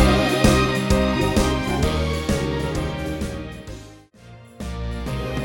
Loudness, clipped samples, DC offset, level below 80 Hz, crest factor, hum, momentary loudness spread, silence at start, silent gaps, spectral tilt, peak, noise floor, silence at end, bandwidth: -21 LUFS; under 0.1%; under 0.1%; -28 dBFS; 18 dB; none; 17 LU; 0 s; none; -5.5 dB/octave; -4 dBFS; -44 dBFS; 0 s; 17 kHz